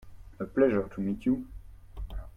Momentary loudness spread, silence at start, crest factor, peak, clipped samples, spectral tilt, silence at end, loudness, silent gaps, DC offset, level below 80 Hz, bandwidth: 19 LU; 0 s; 18 dB; -12 dBFS; under 0.1%; -9 dB/octave; 0.05 s; -29 LUFS; none; under 0.1%; -44 dBFS; 6.6 kHz